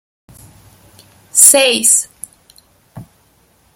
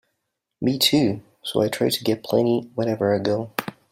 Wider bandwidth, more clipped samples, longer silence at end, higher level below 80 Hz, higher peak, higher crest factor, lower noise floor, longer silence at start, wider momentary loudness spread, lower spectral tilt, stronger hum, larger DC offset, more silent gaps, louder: first, over 20 kHz vs 16 kHz; first, 0.4% vs under 0.1%; first, 0.75 s vs 0.2 s; about the same, -58 dBFS vs -62 dBFS; first, 0 dBFS vs -4 dBFS; about the same, 16 dB vs 20 dB; second, -54 dBFS vs -78 dBFS; first, 1.35 s vs 0.6 s; first, 26 LU vs 9 LU; second, 0 dB/octave vs -5 dB/octave; neither; neither; neither; first, -8 LUFS vs -22 LUFS